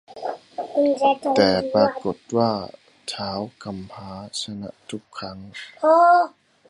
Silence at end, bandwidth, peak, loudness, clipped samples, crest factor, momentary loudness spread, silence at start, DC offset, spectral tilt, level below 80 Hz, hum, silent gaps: 0.4 s; 11.5 kHz; -2 dBFS; -21 LUFS; under 0.1%; 20 dB; 20 LU; 0.1 s; under 0.1%; -5 dB/octave; -58 dBFS; none; none